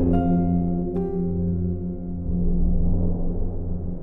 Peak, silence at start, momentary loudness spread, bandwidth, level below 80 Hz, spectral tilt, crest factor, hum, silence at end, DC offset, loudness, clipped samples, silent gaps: -8 dBFS; 0 s; 9 LU; 3 kHz; -26 dBFS; -13.5 dB/octave; 14 dB; none; 0 s; under 0.1%; -25 LUFS; under 0.1%; none